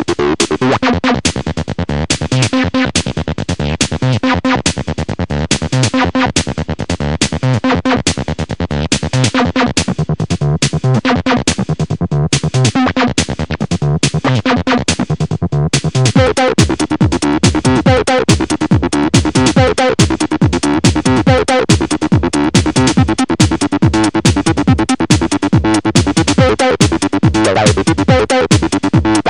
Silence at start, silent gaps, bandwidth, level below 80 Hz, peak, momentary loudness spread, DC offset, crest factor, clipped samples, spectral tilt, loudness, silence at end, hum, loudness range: 0 s; none; 11 kHz; -28 dBFS; 0 dBFS; 6 LU; 1%; 12 dB; under 0.1%; -5 dB/octave; -13 LUFS; 0 s; none; 3 LU